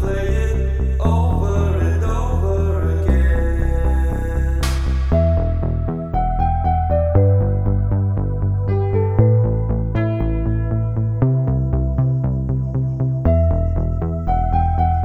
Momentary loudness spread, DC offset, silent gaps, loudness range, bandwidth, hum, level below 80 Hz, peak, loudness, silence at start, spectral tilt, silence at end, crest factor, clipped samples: 5 LU; under 0.1%; none; 2 LU; 11.5 kHz; none; -22 dBFS; -2 dBFS; -19 LUFS; 0 s; -8.5 dB/octave; 0 s; 14 dB; under 0.1%